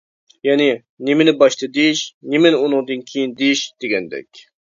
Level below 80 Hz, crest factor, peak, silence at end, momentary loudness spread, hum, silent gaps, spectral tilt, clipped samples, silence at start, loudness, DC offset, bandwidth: -68 dBFS; 18 dB; 0 dBFS; 0.3 s; 10 LU; none; 0.89-0.97 s, 2.14-2.21 s; -4 dB/octave; under 0.1%; 0.45 s; -17 LUFS; under 0.1%; 7.6 kHz